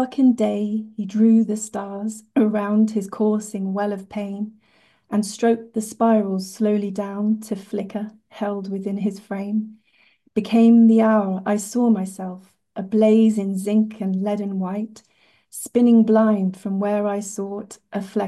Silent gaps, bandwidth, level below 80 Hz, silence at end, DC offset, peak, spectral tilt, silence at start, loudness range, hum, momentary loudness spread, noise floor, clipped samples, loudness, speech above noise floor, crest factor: none; 12.5 kHz; -68 dBFS; 0 s; under 0.1%; -6 dBFS; -7 dB/octave; 0 s; 6 LU; none; 15 LU; -60 dBFS; under 0.1%; -21 LUFS; 40 dB; 14 dB